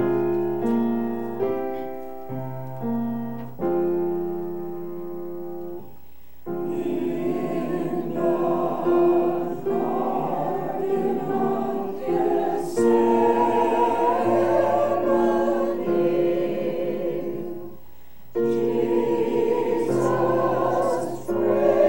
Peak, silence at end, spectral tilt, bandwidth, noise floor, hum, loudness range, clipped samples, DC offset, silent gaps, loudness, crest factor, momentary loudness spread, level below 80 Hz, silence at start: -6 dBFS; 0 s; -7.5 dB/octave; 16.5 kHz; -52 dBFS; none; 8 LU; under 0.1%; 1%; none; -24 LUFS; 18 dB; 13 LU; -58 dBFS; 0 s